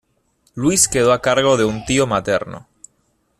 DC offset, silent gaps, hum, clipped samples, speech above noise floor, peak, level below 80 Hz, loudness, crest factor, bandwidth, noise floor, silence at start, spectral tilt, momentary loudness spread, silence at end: under 0.1%; none; none; under 0.1%; 48 dB; 0 dBFS; -46 dBFS; -16 LUFS; 18 dB; 14 kHz; -64 dBFS; 0.55 s; -3.5 dB/octave; 16 LU; 0.8 s